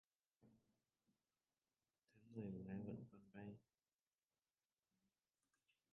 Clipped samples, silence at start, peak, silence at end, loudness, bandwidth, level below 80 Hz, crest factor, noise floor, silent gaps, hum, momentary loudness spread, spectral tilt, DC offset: under 0.1%; 0.4 s; -38 dBFS; 2.3 s; -56 LUFS; 3.6 kHz; -84 dBFS; 22 dB; under -90 dBFS; none; none; 9 LU; -8 dB/octave; under 0.1%